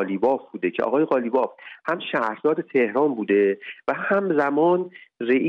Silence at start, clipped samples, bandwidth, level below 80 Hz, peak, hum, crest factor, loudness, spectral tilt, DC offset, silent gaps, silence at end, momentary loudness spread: 0 s; under 0.1%; 5.8 kHz; -70 dBFS; -8 dBFS; none; 14 dB; -23 LUFS; -8 dB/octave; under 0.1%; none; 0 s; 8 LU